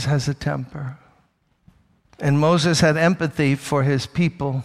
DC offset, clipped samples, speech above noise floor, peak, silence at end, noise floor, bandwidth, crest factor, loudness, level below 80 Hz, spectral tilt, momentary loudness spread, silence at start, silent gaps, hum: under 0.1%; under 0.1%; 43 dB; -6 dBFS; 0 s; -63 dBFS; 13.5 kHz; 16 dB; -20 LUFS; -48 dBFS; -6 dB/octave; 11 LU; 0 s; none; none